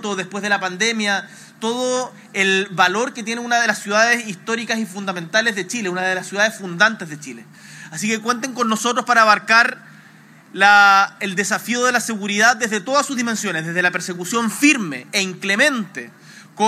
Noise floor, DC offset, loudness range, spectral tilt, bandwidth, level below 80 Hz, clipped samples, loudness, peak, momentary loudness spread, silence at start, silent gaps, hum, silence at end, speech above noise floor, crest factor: -46 dBFS; under 0.1%; 5 LU; -2.5 dB/octave; 16 kHz; -86 dBFS; under 0.1%; -17 LUFS; 0 dBFS; 13 LU; 0 s; none; none; 0 s; 27 dB; 20 dB